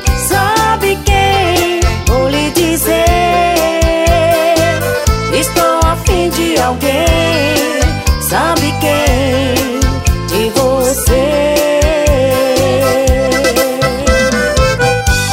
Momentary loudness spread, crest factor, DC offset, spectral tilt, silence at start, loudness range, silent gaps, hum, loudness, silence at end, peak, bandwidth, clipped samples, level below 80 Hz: 3 LU; 10 dB; under 0.1%; -4.5 dB/octave; 0 s; 1 LU; none; none; -11 LUFS; 0 s; 0 dBFS; 16.5 kHz; under 0.1%; -18 dBFS